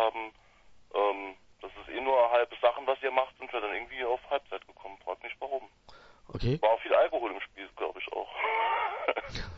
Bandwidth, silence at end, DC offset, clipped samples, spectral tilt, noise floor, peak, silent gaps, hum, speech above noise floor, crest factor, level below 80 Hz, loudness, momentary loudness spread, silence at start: 7.4 kHz; 0 s; under 0.1%; under 0.1%; -6 dB/octave; -58 dBFS; -10 dBFS; none; none; 27 dB; 22 dB; -54 dBFS; -31 LUFS; 17 LU; 0 s